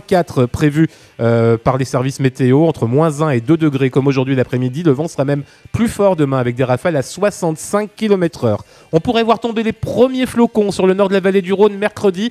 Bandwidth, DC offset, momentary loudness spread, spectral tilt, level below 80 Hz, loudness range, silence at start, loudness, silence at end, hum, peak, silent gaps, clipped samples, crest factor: 14 kHz; under 0.1%; 6 LU; -7 dB/octave; -44 dBFS; 2 LU; 0.1 s; -15 LUFS; 0 s; none; 0 dBFS; none; under 0.1%; 14 dB